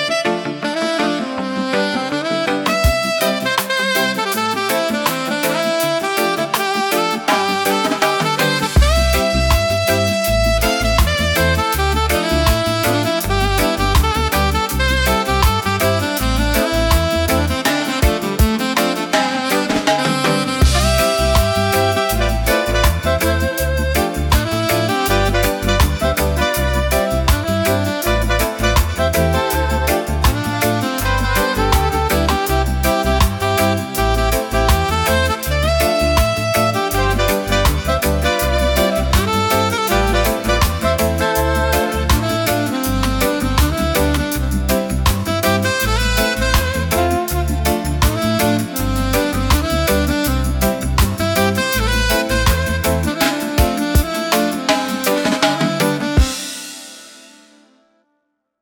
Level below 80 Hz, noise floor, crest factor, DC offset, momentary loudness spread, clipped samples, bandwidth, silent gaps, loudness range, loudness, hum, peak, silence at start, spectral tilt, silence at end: -22 dBFS; -70 dBFS; 16 dB; under 0.1%; 3 LU; under 0.1%; 19 kHz; none; 2 LU; -16 LUFS; none; -2 dBFS; 0 s; -4.5 dB/octave; 1.4 s